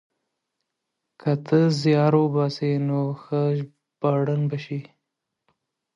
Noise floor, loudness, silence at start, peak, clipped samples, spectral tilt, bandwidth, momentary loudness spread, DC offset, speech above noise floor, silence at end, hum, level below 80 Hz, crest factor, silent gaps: -82 dBFS; -23 LUFS; 1.2 s; -6 dBFS; under 0.1%; -8 dB/octave; 7.8 kHz; 11 LU; under 0.1%; 60 dB; 1.15 s; none; -70 dBFS; 18 dB; none